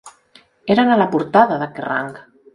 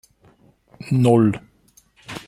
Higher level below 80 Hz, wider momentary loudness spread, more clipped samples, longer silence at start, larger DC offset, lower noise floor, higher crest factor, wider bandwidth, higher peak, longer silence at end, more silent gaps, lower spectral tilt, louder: about the same, -60 dBFS vs -56 dBFS; second, 12 LU vs 21 LU; neither; second, 0.05 s vs 0.85 s; neither; second, -52 dBFS vs -56 dBFS; about the same, 18 dB vs 20 dB; second, 11 kHz vs 12.5 kHz; about the same, 0 dBFS vs -2 dBFS; first, 0.35 s vs 0.05 s; neither; second, -6.5 dB/octave vs -8 dB/octave; about the same, -17 LUFS vs -18 LUFS